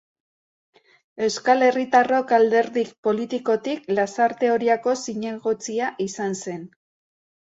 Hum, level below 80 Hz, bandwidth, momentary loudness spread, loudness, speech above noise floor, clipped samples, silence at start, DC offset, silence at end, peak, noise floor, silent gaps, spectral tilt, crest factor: none; -70 dBFS; 8 kHz; 9 LU; -22 LUFS; over 69 dB; under 0.1%; 1.15 s; under 0.1%; 0.9 s; -4 dBFS; under -90 dBFS; 2.98-3.03 s; -4 dB/octave; 18 dB